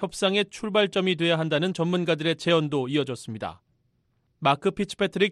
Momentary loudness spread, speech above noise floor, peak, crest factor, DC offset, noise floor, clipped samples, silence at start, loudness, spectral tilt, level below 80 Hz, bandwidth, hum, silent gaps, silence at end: 8 LU; 45 dB; -8 dBFS; 18 dB; under 0.1%; -70 dBFS; under 0.1%; 0 s; -25 LUFS; -5.5 dB/octave; -62 dBFS; 12.5 kHz; none; none; 0 s